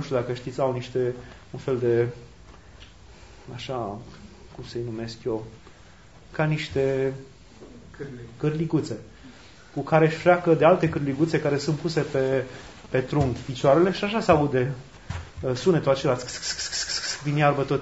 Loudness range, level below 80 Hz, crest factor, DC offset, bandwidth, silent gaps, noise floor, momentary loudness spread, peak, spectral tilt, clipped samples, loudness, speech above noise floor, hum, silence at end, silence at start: 10 LU; -52 dBFS; 22 dB; 0.2%; 8 kHz; none; -50 dBFS; 19 LU; -4 dBFS; -5.5 dB/octave; under 0.1%; -24 LUFS; 26 dB; none; 0 s; 0 s